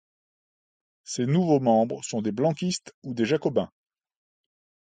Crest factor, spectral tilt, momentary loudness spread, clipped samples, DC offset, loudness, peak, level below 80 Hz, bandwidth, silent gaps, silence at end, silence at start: 18 dB; -6 dB/octave; 12 LU; under 0.1%; under 0.1%; -25 LUFS; -10 dBFS; -66 dBFS; 9.6 kHz; 2.94-3.02 s; 1.3 s; 1.05 s